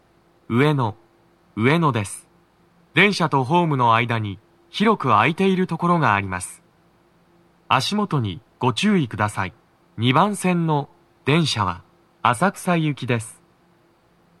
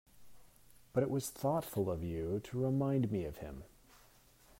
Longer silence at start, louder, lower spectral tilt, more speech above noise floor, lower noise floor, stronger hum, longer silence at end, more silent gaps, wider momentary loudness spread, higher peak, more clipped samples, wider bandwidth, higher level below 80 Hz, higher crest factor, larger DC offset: first, 0.5 s vs 0.15 s; first, -20 LUFS vs -37 LUFS; second, -5.5 dB/octave vs -7 dB/octave; first, 39 dB vs 28 dB; second, -58 dBFS vs -64 dBFS; neither; first, 1.1 s vs 0.65 s; neither; about the same, 13 LU vs 11 LU; first, 0 dBFS vs -20 dBFS; neither; second, 13.5 kHz vs 16 kHz; about the same, -62 dBFS vs -60 dBFS; about the same, 22 dB vs 18 dB; neither